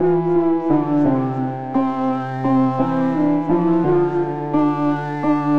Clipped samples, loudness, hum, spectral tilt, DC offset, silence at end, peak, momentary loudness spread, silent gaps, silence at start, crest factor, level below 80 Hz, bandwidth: under 0.1%; -19 LUFS; none; -10 dB/octave; 1%; 0 s; -6 dBFS; 5 LU; none; 0 s; 12 dB; -50 dBFS; 6.2 kHz